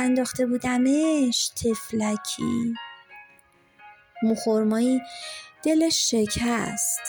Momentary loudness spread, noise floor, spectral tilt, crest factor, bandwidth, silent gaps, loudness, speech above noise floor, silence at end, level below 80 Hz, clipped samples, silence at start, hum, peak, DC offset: 11 LU; -58 dBFS; -3.5 dB/octave; 12 dB; over 20 kHz; none; -24 LUFS; 34 dB; 0 s; -54 dBFS; under 0.1%; 0 s; none; -12 dBFS; under 0.1%